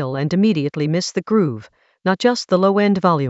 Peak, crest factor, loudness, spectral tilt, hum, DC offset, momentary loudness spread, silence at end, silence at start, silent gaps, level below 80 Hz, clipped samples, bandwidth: -2 dBFS; 16 dB; -18 LUFS; -6 dB/octave; none; under 0.1%; 7 LU; 0 s; 0 s; none; -60 dBFS; under 0.1%; 8 kHz